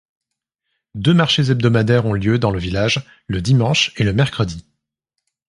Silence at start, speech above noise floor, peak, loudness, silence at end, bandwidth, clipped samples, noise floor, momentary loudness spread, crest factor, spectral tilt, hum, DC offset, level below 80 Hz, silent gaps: 0.95 s; 62 dB; 0 dBFS; -17 LUFS; 0.9 s; 11.5 kHz; under 0.1%; -78 dBFS; 9 LU; 18 dB; -5.5 dB/octave; none; under 0.1%; -40 dBFS; none